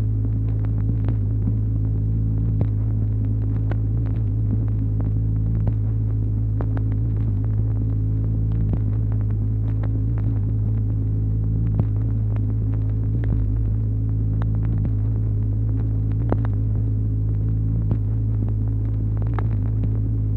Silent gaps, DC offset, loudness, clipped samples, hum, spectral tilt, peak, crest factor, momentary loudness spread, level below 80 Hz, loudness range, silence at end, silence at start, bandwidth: none; 0.2%; -23 LUFS; under 0.1%; none; -12.5 dB/octave; -4 dBFS; 18 dB; 1 LU; -26 dBFS; 0 LU; 0 s; 0 s; 2.2 kHz